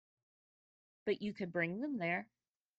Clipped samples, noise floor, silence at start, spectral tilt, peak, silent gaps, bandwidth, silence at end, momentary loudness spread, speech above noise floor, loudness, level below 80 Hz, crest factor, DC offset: under 0.1%; under -90 dBFS; 1.05 s; -8 dB/octave; -22 dBFS; none; 8 kHz; 0.55 s; 5 LU; over 51 dB; -39 LUFS; -82 dBFS; 20 dB; under 0.1%